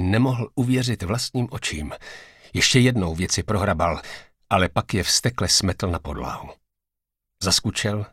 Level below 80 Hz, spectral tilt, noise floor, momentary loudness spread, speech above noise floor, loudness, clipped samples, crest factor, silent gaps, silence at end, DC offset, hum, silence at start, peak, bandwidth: -44 dBFS; -4 dB/octave; -83 dBFS; 14 LU; 61 dB; -22 LUFS; under 0.1%; 20 dB; none; 0.05 s; under 0.1%; none; 0 s; -4 dBFS; 16 kHz